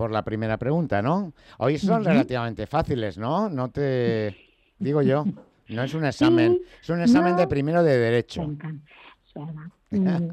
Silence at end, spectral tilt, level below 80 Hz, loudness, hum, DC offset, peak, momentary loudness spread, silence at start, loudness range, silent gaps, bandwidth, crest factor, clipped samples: 0 s; -7.5 dB/octave; -52 dBFS; -23 LUFS; none; under 0.1%; -10 dBFS; 16 LU; 0 s; 4 LU; none; 9.8 kHz; 14 dB; under 0.1%